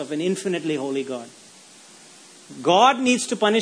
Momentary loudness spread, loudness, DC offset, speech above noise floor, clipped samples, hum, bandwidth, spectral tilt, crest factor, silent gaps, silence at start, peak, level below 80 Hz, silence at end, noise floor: 17 LU; -21 LUFS; under 0.1%; 26 dB; under 0.1%; none; 11 kHz; -3.5 dB/octave; 20 dB; none; 0 s; -2 dBFS; -74 dBFS; 0 s; -48 dBFS